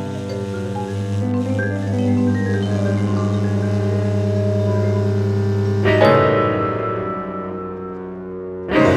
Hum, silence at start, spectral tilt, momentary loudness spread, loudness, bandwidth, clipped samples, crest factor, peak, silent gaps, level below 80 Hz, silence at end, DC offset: none; 0 s; -8 dB/octave; 13 LU; -19 LUFS; 8.8 kHz; under 0.1%; 18 dB; 0 dBFS; none; -50 dBFS; 0 s; under 0.1%